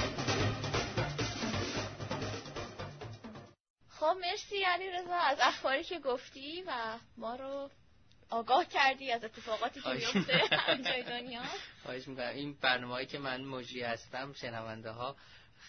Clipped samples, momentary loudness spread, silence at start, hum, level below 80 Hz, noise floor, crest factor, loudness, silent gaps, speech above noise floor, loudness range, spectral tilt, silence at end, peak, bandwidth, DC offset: under 0.1%; 14 LU; 0 s; none; -60 dBFS; -65 dBFS; 22 dB; -35 LUFS; 3.60-3.64 s, 3.70-3.76 s; 29 dB; 6 LU; -2 dB/octave; 0 s; -14 dBFS; 6.4 kHz; under 0.1%